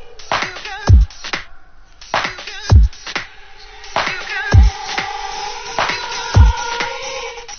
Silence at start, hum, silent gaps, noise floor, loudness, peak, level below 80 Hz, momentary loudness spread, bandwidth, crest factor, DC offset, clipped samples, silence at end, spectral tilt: 0 s; none; none; -38 dBFS; -18 LUFS; 0 dBFS; -18 dBFS; 12 LU; 6.8 kHz; 16 dB; under 0.1%; under 0.1%; 0 s; -4.5 dB/octave